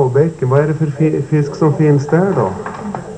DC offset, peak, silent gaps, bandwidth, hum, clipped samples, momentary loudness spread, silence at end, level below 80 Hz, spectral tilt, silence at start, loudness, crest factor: under 0.1%; 0 dBFS; none; 9 kHz; none; under 0.1%; 9 LU; 0 s; -48 dBFS; -9 dB/octave; 0 s; -15 LUFS; 14 dB